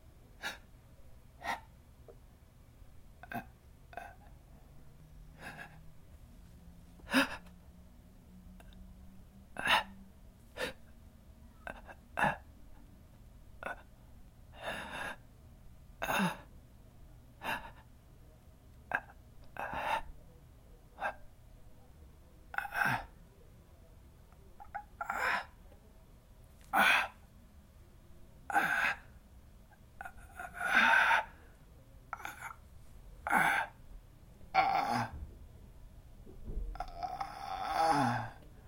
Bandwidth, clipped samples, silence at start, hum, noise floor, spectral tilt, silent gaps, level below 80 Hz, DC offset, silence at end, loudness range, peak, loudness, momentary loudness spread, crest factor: 16.5 kHz; under 0.1%; 0.15 s; none; -59 dBFS; -3.5 dB/octave; none; -56 dBFS; under 0.1%; 0 s; 15 LU; -14 dBFS; -34 LUFS; 27 LU; 26 dB